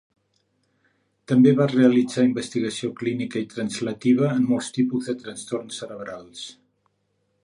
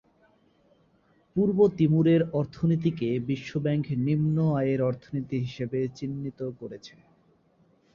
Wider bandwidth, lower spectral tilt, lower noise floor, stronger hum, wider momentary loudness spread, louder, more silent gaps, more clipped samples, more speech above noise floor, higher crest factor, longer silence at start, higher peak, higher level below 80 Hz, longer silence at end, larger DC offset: first, 11 kHz vs 7 kHz; second, -6 dB/octave vs -9 dB/octave; first, -71 dBFS vs -65 dBFS; neither; first, 18 LU vs 12 LU; first, -22 LUFS vs -27 LUFS; neither; neither; first, 49 dB vs 39 dB; about the same, 18 dB vs 16 dB; about the same, 1.3 s vs 1.35 s; first, -4 dBFS vs -10 dBFS; second, -68 dBFS vs -60 dBFS; second, 0.9 s vs 1.05 s; neither